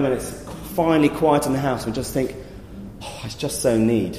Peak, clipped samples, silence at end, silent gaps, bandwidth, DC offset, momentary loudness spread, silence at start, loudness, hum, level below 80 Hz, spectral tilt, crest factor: -6 dBFS; under 0.1%; 0 s; none; 15.5 kHz; under 0.1%; 18 LU; 0 s; -21 LUFS; none; -42 dBFS; -5.5 dB/octave; 16 dB